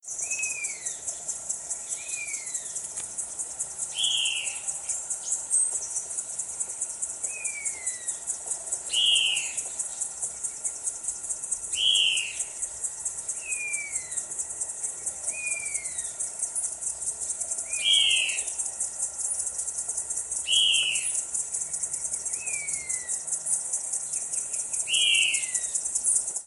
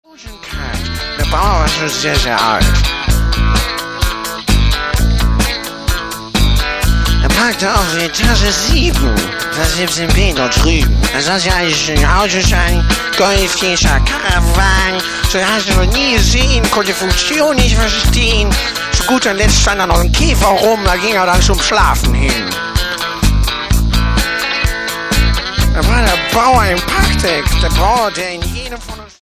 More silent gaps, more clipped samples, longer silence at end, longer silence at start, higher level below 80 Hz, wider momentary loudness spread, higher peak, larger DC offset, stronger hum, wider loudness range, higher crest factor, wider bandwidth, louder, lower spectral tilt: neither; neither; second, 0 s vs 0.15 s; second, 0.05 s vs 0.2 s; second, -64 dBFS vs -16 dBFS; first, 10 LU vs 7 LU; second, -10 dBFS vs 0 dBFS; neither; neither; about the same, 5 LU vs 3 LU; first, 20 dB vs 12 dB; second, 11.5 kHz vs 16 kHz; second, -26 LUFS vs -12 LUFS; second, 3 dB/octave vs -3.5 dB/octave